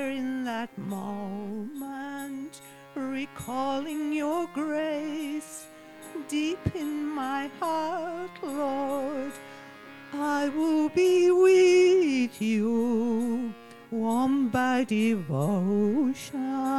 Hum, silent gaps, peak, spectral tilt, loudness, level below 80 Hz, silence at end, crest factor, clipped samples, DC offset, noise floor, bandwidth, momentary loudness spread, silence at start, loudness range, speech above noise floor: none; none; -12 dBFS; -6 dB/octave; -27 LUFS; -62 dBFS; 0 s; 16 dB; under 0.1%; 0.1%; -47 dBFS; 14.5 kHz; 17 LU; 0 s; 10 LU; 21 dB